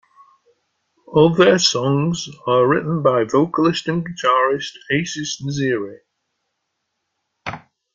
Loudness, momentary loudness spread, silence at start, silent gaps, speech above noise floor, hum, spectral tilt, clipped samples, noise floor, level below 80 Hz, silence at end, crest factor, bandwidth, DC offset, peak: -18 LUFS; 15 LU; 1.1 s; none; 58 dB; none; -5 dB/octave; under 0.1%; -75 dBFS; -58 dBFS; 0.35 s; 18 dB; 9.2 kHz; under 0.1%; -2 dBFS